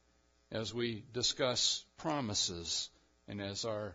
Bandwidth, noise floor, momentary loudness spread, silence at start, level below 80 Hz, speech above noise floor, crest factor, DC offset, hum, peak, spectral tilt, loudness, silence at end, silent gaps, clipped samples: 8 kHz; -72 dBFS; 12 LU; 0.5 s; -64 dBFS; 35 dB; 20 dB; under 0.1%; none; -18 dBFS; -2.5 dB/octave; -36 LUFS; 0 s; none; under 0.1%